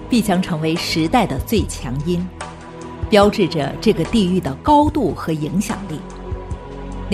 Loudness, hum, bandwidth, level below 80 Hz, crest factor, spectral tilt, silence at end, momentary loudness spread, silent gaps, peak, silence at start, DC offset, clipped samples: -18 LUFS; none; 14.5 kHz; -34 dBFS; 18 dB; -6 dB/octave; 0 s; 17 LU; none; -2 dBFS; 0 s; under 0.1%; under 0.1%